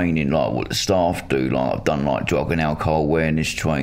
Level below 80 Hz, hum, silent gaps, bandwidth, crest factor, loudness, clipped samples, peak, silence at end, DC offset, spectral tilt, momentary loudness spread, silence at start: -38 dBFS; none; none; 16 kHz; 16 dB; -21 LUFS; under 0.1%; -4 dBFS; 0 s; under 0.1%; -5.5 dB/octave; 2 LU; 0 s